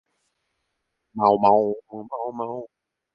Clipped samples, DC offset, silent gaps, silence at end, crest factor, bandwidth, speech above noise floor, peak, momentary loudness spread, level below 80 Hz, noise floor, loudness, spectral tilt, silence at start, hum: under 0.1%; under 0.1%; none; 0.5 s; 20 dB; 5.6 kHz; 55 dB; -4 dBFS; 18 LU; -68 dBFS; -77 dBFS; -22 LUFS; -9 dB/octave; 1.15 s; none